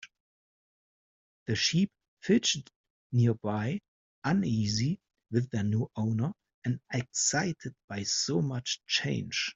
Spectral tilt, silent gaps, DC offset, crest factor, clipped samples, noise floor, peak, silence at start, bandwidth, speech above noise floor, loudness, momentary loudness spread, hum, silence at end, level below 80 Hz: -4 dB/octave; 0.20-1.46 s, 2.08-2.17 s, 2.76-2.84 s, 2.90-3.10 s, 3.88-4.22 s, 6.54-6.62 s, 7.84-7.88 s; under 0.1%; 18 dB; under 0.1%; under -90 dBFS; -12 dBFS; 0 s; 8 kHz; over 60 dB; -30 LUFS; 9 LU; none; 0.05 s; -64 dBFS